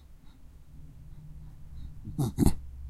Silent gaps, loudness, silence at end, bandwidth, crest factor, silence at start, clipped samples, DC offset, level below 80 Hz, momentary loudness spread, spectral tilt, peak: none; -30 LUFS; 0 s; 15 kHz; 26 dB; 0 s; under 0.1%; under 0.1%; -40 dBFS; 25 LU; -7 dB/octave; -6 dBFS